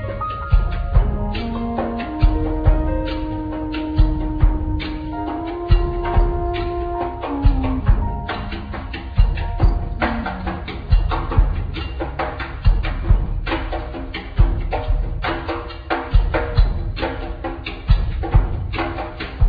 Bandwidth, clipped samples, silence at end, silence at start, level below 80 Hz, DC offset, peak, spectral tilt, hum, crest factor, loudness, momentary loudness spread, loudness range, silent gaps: 5 kHz; under 0.1%; 0 s; 0 s; -20 dBFS; under 0.1%; -2 dBFS; -9.5 dB/octave; none; 16 dB; -22 LUFS; 8 LU; 2 LU; none